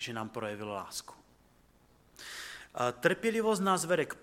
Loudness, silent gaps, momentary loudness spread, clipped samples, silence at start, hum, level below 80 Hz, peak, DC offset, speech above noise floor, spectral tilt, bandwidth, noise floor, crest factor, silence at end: -33 LUFS; none; 14 LU; under 0.1%; 0 s; 60 Hz at -65 dBFS; -68 dBFS; -10 dBFS; under 0.1%; 32 dB; -4 dB/octave; 16.5 kHz; -64 dBFS; 24 dB; 0 s